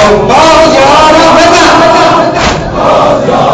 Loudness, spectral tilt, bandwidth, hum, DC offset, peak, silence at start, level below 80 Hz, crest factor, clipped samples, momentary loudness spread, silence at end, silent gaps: -4 LUFS; -4 dB/octave; 11 kHz; none; under 0.1%; 0 dBFS; 0 s; -26 dBFS; 4 dB; 10%; 5 LU; 0 s; none